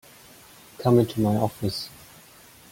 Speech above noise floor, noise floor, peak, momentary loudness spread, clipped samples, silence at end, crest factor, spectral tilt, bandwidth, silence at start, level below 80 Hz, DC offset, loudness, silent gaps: 28 dB; -51 dBFS; -6 dBFS; 12 LU; under 0.1%; 0.85 s; 20 dB; -7 dB/octave; 17 kHz; 0.8 s; -56 dBFS; under 0.1%; -24 LUFS; none